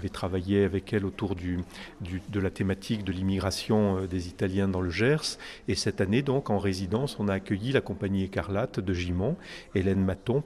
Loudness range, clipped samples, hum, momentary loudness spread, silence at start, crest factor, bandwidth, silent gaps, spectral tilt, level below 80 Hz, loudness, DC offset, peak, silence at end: 2 LU; under 0.1%; none; 8 LU; 0 s; 18 dB; 13.5 kHz; none; -6 dB/octave; -50 dBFS; -29 LUFS; under 0.1%; -10 dBFS; 0 s